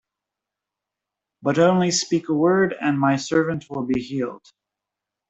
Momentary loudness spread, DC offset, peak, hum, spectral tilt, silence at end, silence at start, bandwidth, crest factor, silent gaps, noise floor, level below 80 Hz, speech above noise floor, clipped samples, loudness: 10 LU; under 0.1%; -4 dBFS; none; -5 dB/octave; 0.95 s; 1.45 s; 8.2 kHz; 18 dB; none; -86 dBFS; -62 dBFS; 65 dB; under 0.1%; -21 LUFS